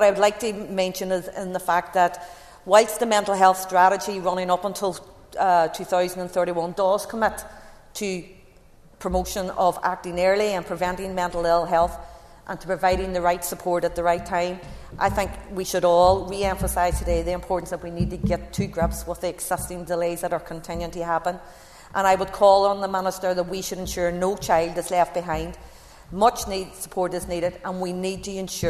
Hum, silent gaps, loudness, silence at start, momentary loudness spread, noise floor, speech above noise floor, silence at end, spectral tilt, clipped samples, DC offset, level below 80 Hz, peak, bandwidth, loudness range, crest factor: none; none; -23 LUFS; 0 s; 12 LU; -51 dBFS; 28 dB; 0 s; -4.5 dB/octave; under 0.1%; under 0.1%; -40 dBFS; -2 dBFS; 14 kHz; 6 LU; 22 dB